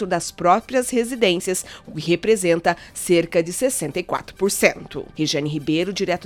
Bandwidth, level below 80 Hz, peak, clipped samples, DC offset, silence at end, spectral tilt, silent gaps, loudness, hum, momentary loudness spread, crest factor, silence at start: 18 kHz; -52 dBFS; 0 dBFS; under 0.1%; under 0.1%; 0 s; -4 dB/octave; none; -21 LUFS; none; 9 LU; 20 dB; 0 s